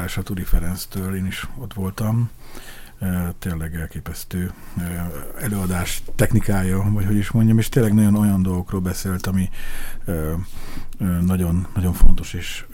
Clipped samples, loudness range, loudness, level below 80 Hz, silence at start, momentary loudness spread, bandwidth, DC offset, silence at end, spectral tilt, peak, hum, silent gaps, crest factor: under 0.1%; 8 LU; -22 LUFS; -24 dBFS; 0 s; 14 LU; 17 kHz; under 0.1%; 0 s; -6.5 dB/octave; 0 dBFS; none; none; 18 dB